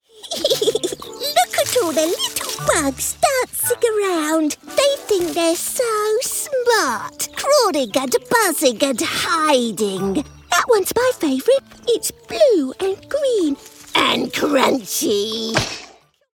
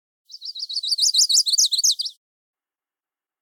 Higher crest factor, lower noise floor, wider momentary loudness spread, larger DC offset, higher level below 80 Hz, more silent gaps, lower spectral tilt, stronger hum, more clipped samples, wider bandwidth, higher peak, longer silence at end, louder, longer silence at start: about the same, 16 dB vs 16 dB; second, -46 dBFS vs under -90 dBFS; second, 7 LU vs 16 LU; neither; first, -50 dBFS vs under -90 dBFS; neither; first, -2.5 dB/octave vs 13 dB/octave; neither; neither; about the same, 19 kHz vs 18 kHz; first, -2 dBFS vs -6 dBFS; second, 0.5 s vs 1.3 s; about the same, -18 LUFS vs -17 LUFS; second, 0.2 s vs 0.35 s